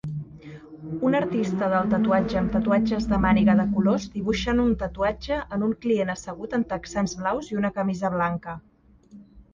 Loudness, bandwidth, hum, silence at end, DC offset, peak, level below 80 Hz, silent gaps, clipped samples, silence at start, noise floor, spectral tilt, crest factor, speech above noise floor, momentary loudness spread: -24 LUFS; 7.4 kHz; none; 0.1 s; under 0.1%; -8 dBFS; -42 dBFS; none; under 0.1%; 0.05 s; -50 dBFS; -6.5 dB/octave; 16 dB; 27 dB; 13 LU